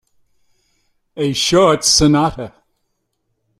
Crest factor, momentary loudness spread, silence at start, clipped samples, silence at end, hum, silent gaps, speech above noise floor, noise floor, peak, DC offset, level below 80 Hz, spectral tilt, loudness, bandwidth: 16 dB; 16 LU; 1.15 s; under 0.1%; 1.1 s; none; none; 56 dB; -70 dBFS; -2 dBFS; under 0.1%; -40 dBFS; -3.5 dB/octave; -13 LUFS; 15 kHz